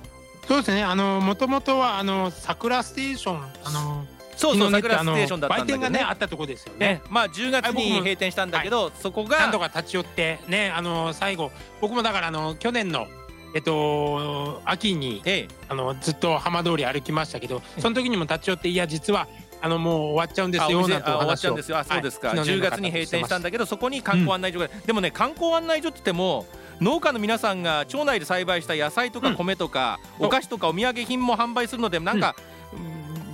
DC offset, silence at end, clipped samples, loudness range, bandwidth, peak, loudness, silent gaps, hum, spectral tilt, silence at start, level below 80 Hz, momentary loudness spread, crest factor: under 0.1%; 0 s; under 0.1%; 2 LU; 16.5 kHz; -4 dBFS; -24 LUFS; none; none; -4.5 dB/octave; 0 s; -52 dBFS; 8 LU; 20 dB